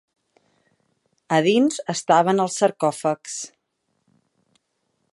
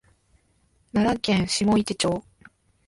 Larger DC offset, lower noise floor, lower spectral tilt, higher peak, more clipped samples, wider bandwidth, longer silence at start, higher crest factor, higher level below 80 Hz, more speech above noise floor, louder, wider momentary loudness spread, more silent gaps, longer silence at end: neither; first, -74 dBFS vs -65 dBFS; about the same, -4.5 dB/octave vs -4.5 dB/octave; first, -4 dBFS vs -10 dBFS; neither; about the same, 11.5 kHz vs 11.5 kHz; first, 1.3 s vs 0.95 s; about the same, 20 dB vs 16 dB; second, -76 dBFS vs -50 dBFS; first, 54 dB vs 42 dB; about the same, -21 LUFS vs -23 LUFS; first, 13 LU vs 6 LU; neither; first, 1.65 s vs 0.65 s